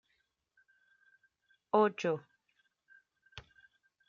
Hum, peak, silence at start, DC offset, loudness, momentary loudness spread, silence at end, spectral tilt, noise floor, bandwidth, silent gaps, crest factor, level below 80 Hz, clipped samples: none; -14 dBFS; 1.75 s; under 0.1%; -32 LUFS; 24 LU; 0.7 s; -4.5 dB/octave; -80 dBFS; 7.4 kHz; none; 26 dB; -78 dBFS; under 0.1%